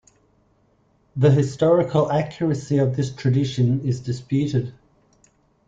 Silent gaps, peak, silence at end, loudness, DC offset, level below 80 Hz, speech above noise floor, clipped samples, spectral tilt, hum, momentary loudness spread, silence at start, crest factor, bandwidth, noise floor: none; -6 dBFS; 0.95 s; -21 LUFS; under 0.1%; -54 dBFS; 42 dB; under 0.1%; -8 dB/octave; none; 8 LU; 1.15 s; 16 dB; 7.8 kHz; -62 dBFS